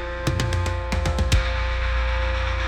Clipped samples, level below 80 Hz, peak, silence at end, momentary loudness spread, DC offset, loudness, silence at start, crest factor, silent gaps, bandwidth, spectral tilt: under 0.1%; -24 dBFS; -10 dBFS; 0 s; 3 LU; under 0.1%; -24 LUFS; 0 s; 14 dB; none; 13 kHz; -5 dB/octave